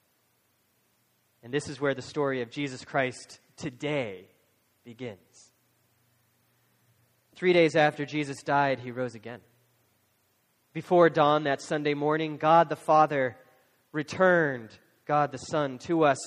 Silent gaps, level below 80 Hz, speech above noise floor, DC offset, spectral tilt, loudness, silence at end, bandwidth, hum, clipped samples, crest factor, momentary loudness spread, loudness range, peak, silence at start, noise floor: none; -72 dBFS; 44 dB; under 0.1%; -5.5 dB/octave; -27 LUFS; 0 s; 12.5 kHz; none; under 0.1%; 22 dB; 19 LU; 11 LU; -6 dBFS; 1.45 s; -71 dBFS